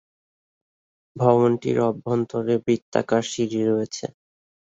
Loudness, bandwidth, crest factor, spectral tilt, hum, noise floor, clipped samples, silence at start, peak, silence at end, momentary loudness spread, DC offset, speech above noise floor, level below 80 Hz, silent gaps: -22 LUFS; 8 kHz; 20 dB; -6.5 dB/octave; none; under -90 dBFS; under 0.1%; 1.15 s; -2 dBFS; 0.65 s; 7 LU; under 0.1%; over 68 dB; -62 dBFS; 2.82-2.92 s